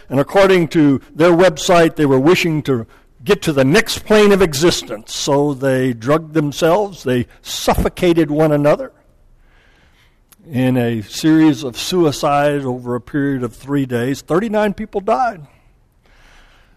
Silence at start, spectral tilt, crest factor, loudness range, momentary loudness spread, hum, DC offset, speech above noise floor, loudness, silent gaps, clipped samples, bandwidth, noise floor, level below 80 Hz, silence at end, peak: 0.1 s; -5.5 dB/octave; 12 dB; 5 LU; 9 LU; none; under 0.1%; 38 dB; -15 LUFS; none; under 0.1%; 14 kHz; -52 dBFS; -38 dBFS; 1.3 s; -4 dBFS